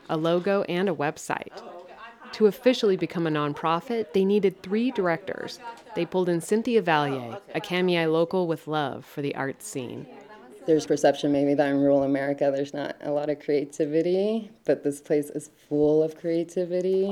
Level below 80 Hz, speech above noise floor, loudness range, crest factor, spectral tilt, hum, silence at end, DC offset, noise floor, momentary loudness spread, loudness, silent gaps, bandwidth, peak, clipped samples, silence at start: -68 dBFS; 20 dB; 3 LU; 18 dB; -6 dB/octave; none; 0 s; under 0.1%; -45 dBFS; 13 LU; -25 LUFS; none; 16 kHz; -6 dBFS; under 0.1%; 0.1 s